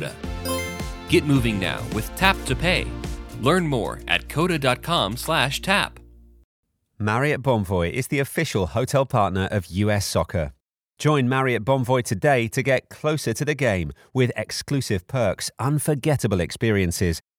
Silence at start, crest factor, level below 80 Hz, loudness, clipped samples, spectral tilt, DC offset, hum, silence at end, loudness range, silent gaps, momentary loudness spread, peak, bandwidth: 0 s; 22 dB; -40 dBFS; -23 LUFS; under 0.1%; -5 dB/octave; under 0.1%; none; 0.2 s; 2 LU; 6.44-6.63 s; 7 LU; 0 dBFS; 19.5 kHz